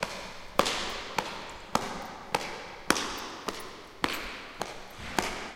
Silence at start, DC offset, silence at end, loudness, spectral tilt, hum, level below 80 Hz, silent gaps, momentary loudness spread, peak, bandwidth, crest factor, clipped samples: 0 s; under 0.1%; 0 s; -33 LUFS; -2.5 dB/octave; none; -52 dBFS; none; 12 LU; 0 dBFS; 17 kHz; 34 dB; under 0.1%